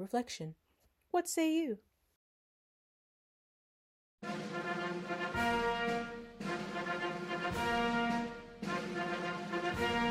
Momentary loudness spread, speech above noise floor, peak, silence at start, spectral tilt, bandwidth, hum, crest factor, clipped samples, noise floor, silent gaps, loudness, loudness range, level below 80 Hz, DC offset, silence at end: 11 LU; 25 dB; -22 dBFS; 0 s; -4.5 dB/octave; 16 kHz; none; 16 dB; under 0.1%; -61 dBFS; 2.16-4.18 s; -37 LUFS; 8 LU; -60 dBFS; under 0.1%; 0 s